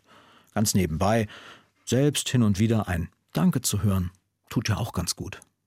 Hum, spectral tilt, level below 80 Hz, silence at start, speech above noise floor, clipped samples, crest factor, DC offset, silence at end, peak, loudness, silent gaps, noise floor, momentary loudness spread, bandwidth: none; -5 dB/octave; -48 dBFS; 0.55 s; 31 dB; under 0.1%; 16 dB; under 0.1%; 0.3 s; -10 dBFS; -26 LUFS; none; -56 dBFS; 11 LU; 16.5 kHz